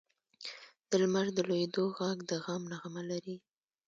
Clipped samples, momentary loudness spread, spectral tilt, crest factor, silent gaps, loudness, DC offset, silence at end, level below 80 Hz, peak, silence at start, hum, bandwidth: under 0.1%; 16 LU; -5 dB/octave; 20 dB; none; -34 LUFS; under 0.1%; 0.5 s; -80 dBFS; -16 dBFS; 0.4 s; none; 7.8 kHz